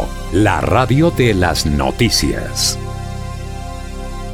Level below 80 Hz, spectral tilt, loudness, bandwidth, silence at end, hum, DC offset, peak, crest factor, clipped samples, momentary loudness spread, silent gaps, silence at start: -26 dBFS; -4.5 dB/octave; -15 LUFS; 17 kHz; 0 s; none; under 0.1%; -2 dBFS; 14 dB; under 0.1%; 15 LU; none; 0 s